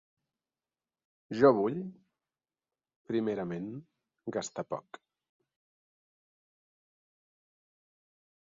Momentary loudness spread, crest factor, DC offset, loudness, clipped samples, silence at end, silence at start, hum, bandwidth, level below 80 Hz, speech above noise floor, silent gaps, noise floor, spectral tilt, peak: 19 LU; 26 dB; under 0.1%; -31 LUFS; under 0.1%; 3.7 s; 1.3 s; none; 7.4 kHz; -76 dBFS; over 59 dB; 2.96-3.05 s; under -90 dBFS; -6 dB/octave; -10 dBFS